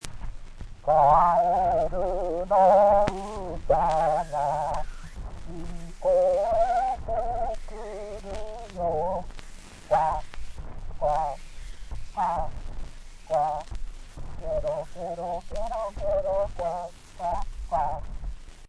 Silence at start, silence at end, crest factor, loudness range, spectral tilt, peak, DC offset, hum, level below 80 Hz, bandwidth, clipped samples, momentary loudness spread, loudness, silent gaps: 0 s; 0 s; 20 dB; 10 LU; -6 dB/octave; -6 dBFS; under 0.1%; none; -38 dBFS; 11 kHz; under 0.1%; 22 LU; -26 LUFS; none